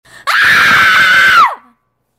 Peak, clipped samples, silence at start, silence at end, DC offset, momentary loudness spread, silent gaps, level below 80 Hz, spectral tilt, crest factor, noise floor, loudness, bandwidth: 0 dBFS; under 0.1%; 0.25 s; 0.6 s; under 0.1%; 6 LU; none; -46 dBFS; -1 dB/octave; 10 dB; -56 dBFS; -7 LUFS; 16.5 kHz